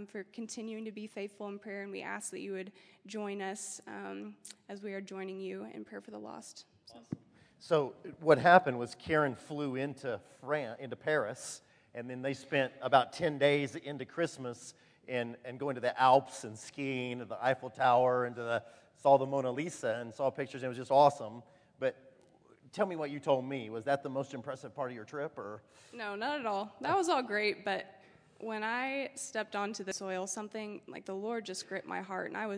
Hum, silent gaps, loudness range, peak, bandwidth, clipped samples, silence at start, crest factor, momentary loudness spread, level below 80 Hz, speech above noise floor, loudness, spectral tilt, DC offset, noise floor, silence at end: none; none; 11 LU; -8 dBFS; 11 kHz; under 0.1%; 0 s; 26 dB; 18 LU; -78 dBFS; 30 dB; -34 LUFS; -4.5 dB/octave; under 0.1%; -64 dBFS; 0 s